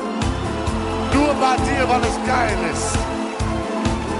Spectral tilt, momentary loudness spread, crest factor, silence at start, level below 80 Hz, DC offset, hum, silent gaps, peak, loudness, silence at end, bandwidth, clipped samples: -5 dB/octave; 6 LU; 12 dB; 0 s; -30 dBFS; under 0.1%; none; none; -8 dBFS; -20 LUFS; 0 s; 11.5 kHz; under 0.1%